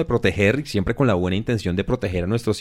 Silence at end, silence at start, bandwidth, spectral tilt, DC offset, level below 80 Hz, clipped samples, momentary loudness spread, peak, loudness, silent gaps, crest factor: 0 s; 0 s; 15 kHz; -6.5 dB/octave; under 0.1%; -38 dBFS; under 0.1%; 5 LU; -4 dBFS; -21 LUFS; none; 16 dB